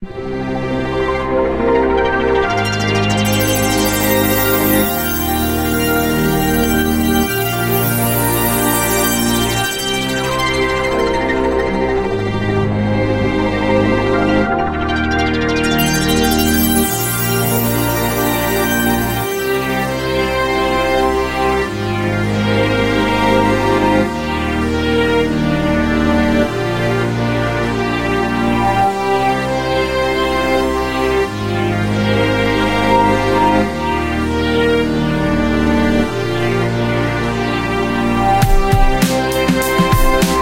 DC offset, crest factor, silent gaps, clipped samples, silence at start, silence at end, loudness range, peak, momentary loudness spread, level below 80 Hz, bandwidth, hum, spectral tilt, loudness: under 0.1%; 14 dB; none; under 0.1%; 0 s; 0 s; 2 LU; 0 dBFS; 4 LU; -26 dBFS; 16.5 kHz; none; -5 dB/octave; -15 LUFS